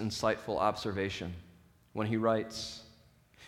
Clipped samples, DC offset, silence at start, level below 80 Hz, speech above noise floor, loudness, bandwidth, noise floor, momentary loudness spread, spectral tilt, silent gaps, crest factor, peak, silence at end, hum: under 0.1%; under 0.1%; 0 s; -60 dBFS; 29 dB; -34 LUFS; 16.5 kHz; -62 dBFS; 14 LU; -5 dB/octave; none; 20 dB; -16 dBFS; 0 s; none